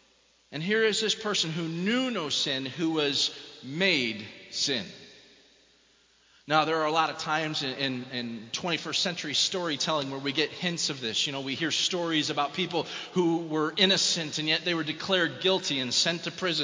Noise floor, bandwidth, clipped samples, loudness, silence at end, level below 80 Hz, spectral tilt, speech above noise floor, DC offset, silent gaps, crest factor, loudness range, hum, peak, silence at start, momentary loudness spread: -64 dBFS; 7.8 kHz; under 0.1%; -27 LUFS; 0 s; -72 dBFS; -3 dB/octave; 35 dB; under 0.1%; none; 22 dB; 4 LU; none; -8 dBFS; 0.5 s; 8 LU